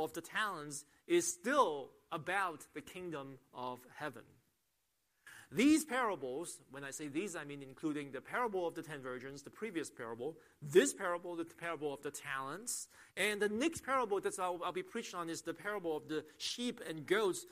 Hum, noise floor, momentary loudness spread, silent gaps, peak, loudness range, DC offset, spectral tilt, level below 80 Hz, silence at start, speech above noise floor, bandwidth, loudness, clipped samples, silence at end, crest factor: none; -82 dBFS; 14 LU; none; -16 dBFS; 5 LU; under 0.1%; -3.5 dB/octave; -78 dBFS; 0 s; 44 dB; 15.5 kHz; -38 LUFS; under 0.1%; 0.05 s; 22 dB